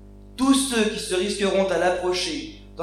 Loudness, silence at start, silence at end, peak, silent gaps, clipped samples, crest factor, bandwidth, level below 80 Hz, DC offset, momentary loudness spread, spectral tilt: -22 LUFS; 0 s; 0 s; -8 dBFS; none; under 0.1%; 16 dB; 15 kHz; -46 dBFS; under 0.1%; 11 LU; -3.5 dB/octave